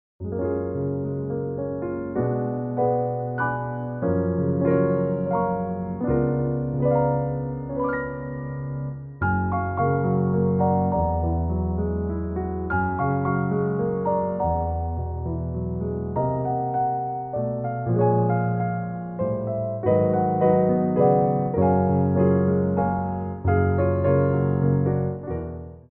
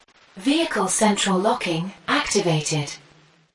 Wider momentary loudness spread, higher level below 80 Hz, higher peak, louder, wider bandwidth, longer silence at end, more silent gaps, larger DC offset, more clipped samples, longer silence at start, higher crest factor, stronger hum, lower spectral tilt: about the same, 9 LU vs 8 LU; first, -40 dBFS vs -56 dBFS; about the same, -6 dBFS vs -6 dBFS; second, -24 LUFS vs -21 LUFS; second, 3 kHz vs 11.5 kHz; second, 0.1 s vs 0.55 s; neither; neither; neither; second, 0.2 s vs 0.35 s; about the same, 18 dB vs 16 dB; neither; first, -11 dB/octave vs -3.5 dB/octave